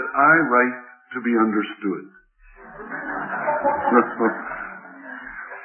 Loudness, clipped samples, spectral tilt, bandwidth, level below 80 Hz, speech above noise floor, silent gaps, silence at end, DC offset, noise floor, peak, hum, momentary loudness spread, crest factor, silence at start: -21 LUFS; under 0.1%; -10.5 dB/octave; 3.3 kHz; -58 dBFS; 27 dB; none; 0 s; under 0.1%; -47 dBFS; -2 dBFS; none; 20 LU; 20 dB; 0 s